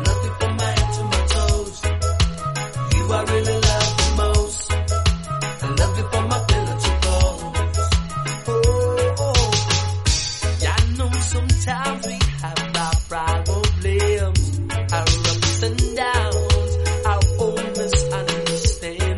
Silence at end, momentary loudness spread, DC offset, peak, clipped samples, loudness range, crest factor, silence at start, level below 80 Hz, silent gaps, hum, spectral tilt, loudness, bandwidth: 0 s; 5 LU; under 0.1%; -2 dBFS; under 0.1%; 1 LU; 16 dB; 0 s; -24 dBFS; none; none; -4 dB/octave; -20 LUFS; 11.5 kHz